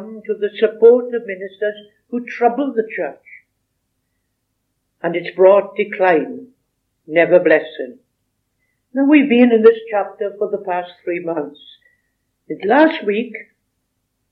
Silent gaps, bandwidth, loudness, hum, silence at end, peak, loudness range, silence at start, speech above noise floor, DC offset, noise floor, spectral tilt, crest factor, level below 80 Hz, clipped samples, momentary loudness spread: none; 4.8 kHz; -16 LUFS; none; 0.9 s; 0 dBFS; 8 LU; 0 s; 56 dB; under 0.1%; -71 dBFS; -8 dB/octave; 18 dB; -78 dBFS; under 0.1%; 17 LU